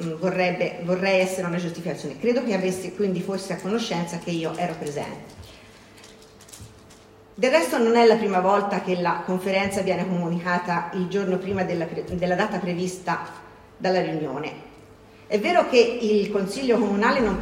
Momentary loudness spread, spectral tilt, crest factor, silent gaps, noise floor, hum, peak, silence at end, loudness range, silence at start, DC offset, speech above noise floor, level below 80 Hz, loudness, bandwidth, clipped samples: 11 LU; -5.5 dB/octave; 20 dB; none; -49 dBFS; none; -4 dBFS; 0 s; 8 LU; 0 s; under 0.1%; 26 dB; -54 dBFS; -23 LUFS; 16 kHz; under 0.1%